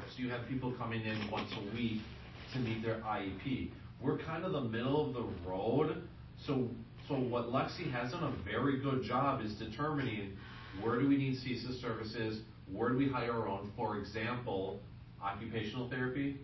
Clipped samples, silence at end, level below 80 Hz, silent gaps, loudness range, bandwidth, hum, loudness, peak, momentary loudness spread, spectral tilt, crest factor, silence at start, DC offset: under 0.1%; 0 s; -58 dBFS; none; 3 LU; 6 kHz; none; -38 LUFS; -20 dBFS; 10 LU; -5.5 dB/octave; 18 dB; 0 s; under 0.1%